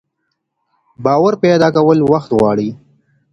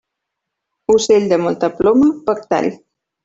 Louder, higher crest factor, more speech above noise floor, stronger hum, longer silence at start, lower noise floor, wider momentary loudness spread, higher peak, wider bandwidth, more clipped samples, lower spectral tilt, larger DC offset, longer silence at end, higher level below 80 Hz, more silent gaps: about the same, -13 LUFS vs -15 LUFS; about the same, 14 dB vs 14 dB; second, 59 dB vs 64 dB; neither; about the same, 1 s vs 0.9 s; second, -71 dBFS vs -78 dBFS; about the same, 8 LU vs 8 LU; about the same, 0 dBFS vs -2 dBFS; first, 10.5 kHz vs 8 kHz; neither; first, -7.5 dB/octave vs -5 dB/octave; neither; about the same, 0.6 s vs 0.5 s; about the same, -50 dBFS vs -52 dBFS; neither